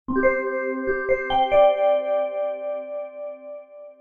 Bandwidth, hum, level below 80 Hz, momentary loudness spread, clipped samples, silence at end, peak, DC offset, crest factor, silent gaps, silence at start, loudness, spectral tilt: 3.7 kHz; none; -46 dBFS; 18 LU; under 0.1%; 0.05 s; -6 dBFS; under 0.1%; 16 dB; none; 0.1 s; -22 LUFS; -6.5 dB/octave